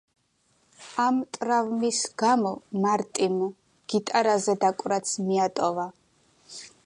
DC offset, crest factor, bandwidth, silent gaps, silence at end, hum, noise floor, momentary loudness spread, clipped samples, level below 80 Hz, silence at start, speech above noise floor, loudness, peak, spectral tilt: under 0.1%; 16 dB; 11.5 kHz; none; 0.2 s; none; -68 dBFS; 11 LU; under 0.1%; -74 dBFS; 0.8 s; 43 dB; -26 LUFS; -10 dBFS; -4 dB/octave